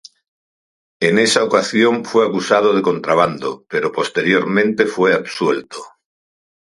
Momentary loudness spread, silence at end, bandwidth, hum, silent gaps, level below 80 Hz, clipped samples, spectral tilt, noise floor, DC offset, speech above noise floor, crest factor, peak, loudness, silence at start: 7 LU; 0.8 s; 11.5 kHz; none; none; -62 dBFS; under 0.1%; -4.5 dB/octave; under -90 dBFS; under 0.1%; over 74 dB; 18 dB; 0 dBFS; -16 LUFS; 1 s